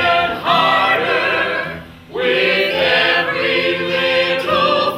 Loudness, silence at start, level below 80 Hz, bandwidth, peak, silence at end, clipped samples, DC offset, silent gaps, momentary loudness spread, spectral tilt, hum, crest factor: -15 LUFS; 0 s; -52 dBFS; 16 kHz; 0 dBFS; 0 s; under 0.1%; under 0.1%; none; 7 LU; -4.5 dB/octave; none; 16 dB